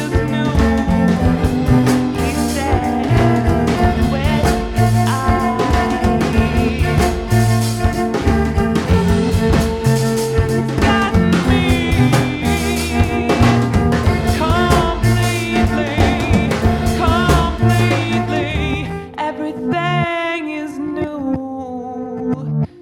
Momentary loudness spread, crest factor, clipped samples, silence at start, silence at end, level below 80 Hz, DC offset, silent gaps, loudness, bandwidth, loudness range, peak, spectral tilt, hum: 8 LU; 14 dB; under 0.1%; 0 s; 0 s; -24 dBFS; under 0.1%; none; -16 LUFS; 17.5 kHz; 4 LU; -2 dBFS; -6 dB/octave; none